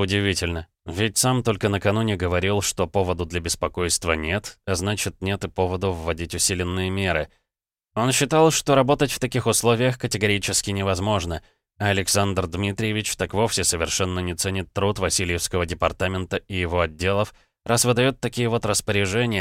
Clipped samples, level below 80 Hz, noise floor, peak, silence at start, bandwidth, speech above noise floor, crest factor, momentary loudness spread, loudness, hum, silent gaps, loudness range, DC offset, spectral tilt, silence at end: under 0.1%; -42 dBFS; -87 dBFS; -4 dBFS; 0 s; 16.5 kHz; 64 dB; 18 dB; 8 LU; -22 LUFS; none; none; 4 LU; under 0.1%; -4 dB/octave; 0 s